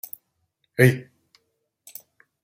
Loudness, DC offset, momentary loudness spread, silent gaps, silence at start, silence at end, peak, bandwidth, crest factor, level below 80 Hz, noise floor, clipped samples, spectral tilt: -21 LUFS; under 0.1%; 24 LU; none; 0.8 s; 1.45 s; -2 dBFS; 16.5 kHz; 24 dB; -64 dBFS; -74 dBFS; under 0.1%; -6.5 dB/octave